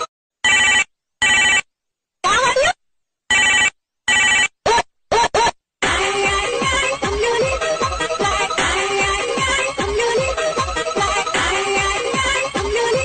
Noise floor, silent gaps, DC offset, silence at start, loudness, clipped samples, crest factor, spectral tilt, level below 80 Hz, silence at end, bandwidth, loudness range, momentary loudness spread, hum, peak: -80 dBFS; 0.08-0.30 s; under 0.1%; 0 s; -17 LUFS; under 0.1%; 14 dB; -1.5 dB/octave; -38 dBFS; 0 s; 9.2 kHz; 3 LU; 7 LU; none; -6 dBFS